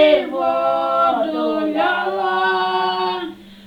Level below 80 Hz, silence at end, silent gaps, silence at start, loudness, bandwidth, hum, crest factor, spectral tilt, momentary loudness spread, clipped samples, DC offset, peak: -58 dBFS; 0 s; none; 0 s; -18 LUFS; 9.6 kHz; none; 16 dB; -5.5 dB/octave; 5 LU; under 0.1%; under 0.1%; -2 dBFS